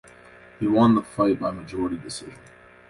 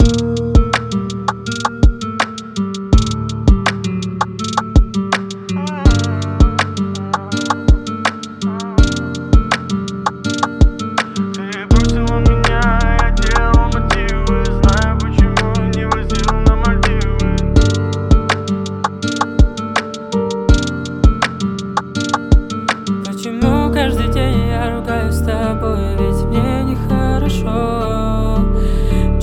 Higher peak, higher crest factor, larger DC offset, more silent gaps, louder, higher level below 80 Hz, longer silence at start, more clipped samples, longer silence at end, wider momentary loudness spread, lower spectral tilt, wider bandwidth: second, -6 dBFS vs 0 dBFS; about the same, 18 dB vs 14 dB; neither; neither; second, -23 LUFS vs -16 LUFS; second, -54 dBFS vs -18 dBFS; first, 0.6 s vs 0 s; neither; first, 0.55 s vs 0 s; first, 17 LU vs 7 LU; about the same, -6.5 dB/octave vs -6 dB/octave; about the same, 11.5 kHz vs 12 kHz